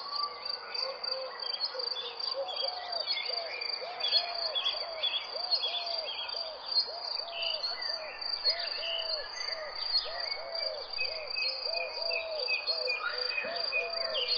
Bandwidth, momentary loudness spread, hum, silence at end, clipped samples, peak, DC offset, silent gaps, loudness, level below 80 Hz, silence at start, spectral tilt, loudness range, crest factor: 7.4 kHz; 6 LU; none; 0 s; under 0.1%; -14 dBFS; under 0.1%; none; -32 LUFS; -70 dBFS; 0 s; 0 dB/octave; 2 LU; 20 dB